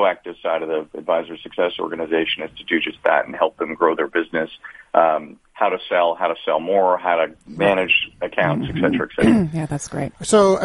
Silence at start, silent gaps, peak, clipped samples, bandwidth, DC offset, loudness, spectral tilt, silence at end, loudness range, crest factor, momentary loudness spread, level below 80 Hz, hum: 0 s; none; -2 dBFS; under 0.1%; 11.5 kHz; under 0.1%; -20 LUFS; -5 dB/octave; 0 s; 3 LU; 18 dB; 9 LU; -50 dBFS; none